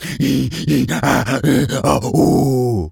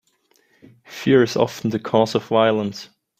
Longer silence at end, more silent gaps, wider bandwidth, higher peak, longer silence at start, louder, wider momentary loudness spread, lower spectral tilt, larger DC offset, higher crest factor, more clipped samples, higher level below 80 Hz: second, 0 s vs 0.35 s; neither; first, 18.5 kHz vs 15.5 kHz; about the same, 0 dBFS vs -2 dBFS; second, 0 s vs 0.9 s; first, -16 LUFS vs -19 LUFS; second, 4 LU vs 12 LU; about the same, -6 dB/octave vs -6 dB/octave; neither; second, 14 dB vs 20 dB; neither; first, -38 dBFS vs -60 dBFS